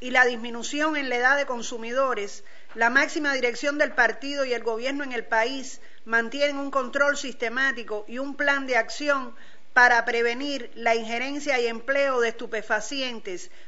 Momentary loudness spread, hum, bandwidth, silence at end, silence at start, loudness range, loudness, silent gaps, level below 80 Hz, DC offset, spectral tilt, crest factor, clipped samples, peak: 11 LU; none; 8 kHz; 0.2 s; 0 s; 3 LU; -24 LUFS; none; -62 dBFS; 2%; -2 dB/octave; 20 dB; under 0.1%; -6 dBFS